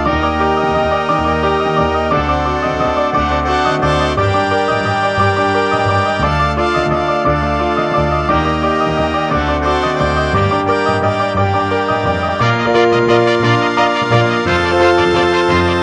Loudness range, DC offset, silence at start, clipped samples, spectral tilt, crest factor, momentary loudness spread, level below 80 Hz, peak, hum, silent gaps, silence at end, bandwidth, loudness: 2 LU; under 0.1%; 0 s; under 0.1%; -6 dB/octave; 14 dB; 3 LU; -28 dBFS; 0 dBFS; none; none; 0 s; 9.8 kHz; -14 LUFS